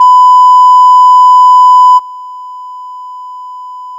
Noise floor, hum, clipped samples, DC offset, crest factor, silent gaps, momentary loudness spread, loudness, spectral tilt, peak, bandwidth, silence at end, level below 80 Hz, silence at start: -24 dBFS; 50 Hz at -100 dBFS; under 0.1%; under 0.1%; 6 dB; none; 22 LU; -3 LUFS; 4.5 dB/octave; 0 dBFS; 9.6 kHz; 0 s; -86 dBFS; 0 s